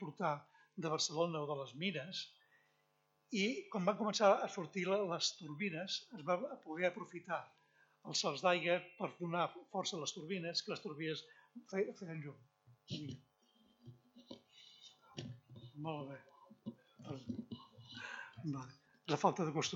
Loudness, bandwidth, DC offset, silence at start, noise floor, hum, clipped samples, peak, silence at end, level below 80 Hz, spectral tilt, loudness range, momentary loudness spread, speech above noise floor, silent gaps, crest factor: -40 LUFS; 8.2 kHz; under 0.1%; 0 s; -79 dBFS; none; under 0.1%; -18 dBFS; 0 s; -86 dBFS; -4 dB/octave; 15 LU; 20 LU; 39 dB; none; 24 dB